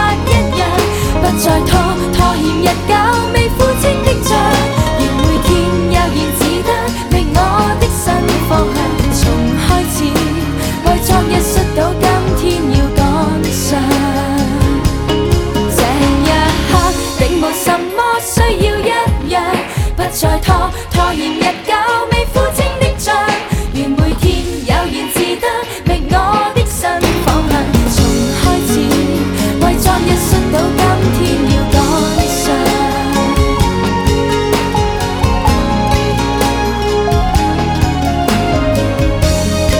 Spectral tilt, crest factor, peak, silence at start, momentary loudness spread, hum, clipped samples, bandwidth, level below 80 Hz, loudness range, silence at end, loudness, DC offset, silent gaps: -5 dB/octave; 12 dB; 0 dBFS; 0 s; 3 LU; none; under 0.1%; 19.5 kHz; -20 dBFS; 2 LU; 0 s; -13 LUFS; under 0.1%; none